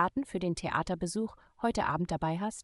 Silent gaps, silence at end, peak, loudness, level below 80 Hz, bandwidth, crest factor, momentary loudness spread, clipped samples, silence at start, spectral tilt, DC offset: none; 0 s; -14 dBFS; -33 LUFS; -54 dBFS; 12 kHz; 18 dB; 4 LU; under 0.1%; 0 s; -5.5 dB/octave; under 0.1%